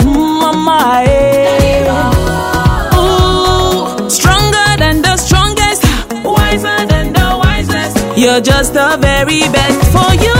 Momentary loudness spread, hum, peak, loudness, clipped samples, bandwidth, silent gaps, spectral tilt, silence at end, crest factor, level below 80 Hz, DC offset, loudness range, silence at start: 4 LU; none; 0 dBFS; -10 LUFS; 0.4%; 16.5 kHz; none; -4.5 dB/octave; 0 s; 10 dB; -18 dBFS; under 0.1%; 1 LU; 0 s